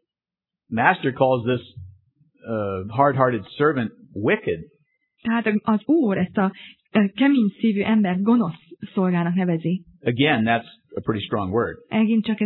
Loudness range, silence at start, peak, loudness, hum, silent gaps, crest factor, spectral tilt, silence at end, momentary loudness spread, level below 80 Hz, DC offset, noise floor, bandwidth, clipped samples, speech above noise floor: 3 LU; 0.7 s; -2 dBFS; -22 LUFS; none; none; 20 dB; -11 dB/octave; 0 s; 10 LU; -60 dBFS; under 0.1%; -89 dBFS; 4.2 kHz; under 0.1%; 68 dB